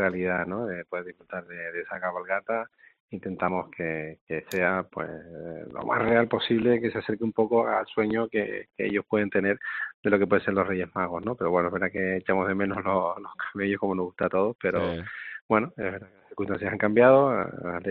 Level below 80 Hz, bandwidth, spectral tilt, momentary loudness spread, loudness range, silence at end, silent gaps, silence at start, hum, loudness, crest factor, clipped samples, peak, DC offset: -64 dBFS; 4.6 kHz; -4.5 dB/octave; 13 LU; 6 LU; 0 s; 3.00-3.08 s, 4.21-4.27 s, 9.94-10.03 s, 14.55-14.59 s, 15.42-15.49 s; 0 s; none; -27 LUFS; 22 dB; under 0.1%; -6 dBFS; under 0.1%